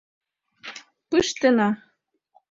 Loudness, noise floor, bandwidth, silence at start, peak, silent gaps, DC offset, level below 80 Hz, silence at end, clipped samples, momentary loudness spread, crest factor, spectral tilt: -22 LUFS; -69 dBFS; 7.8 kHz; 0.65 s; -6 dBFS; none; under 0.1%; -60 dBFS; 0.75 s; under 0.1%; 21 LU; 20 dB; -4 dB/octave